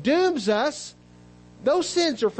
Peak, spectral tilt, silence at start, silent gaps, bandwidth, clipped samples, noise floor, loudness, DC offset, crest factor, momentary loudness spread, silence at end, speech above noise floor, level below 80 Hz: -12 dBFS; -3.5 dB/octave; 0 s; none; 8.8 kHz; under 0.1%; -50 dBFS; -23 LUFS; under 0.1%; 12 dB; 11 LU; 0 s; 27 dB; -60 dBFS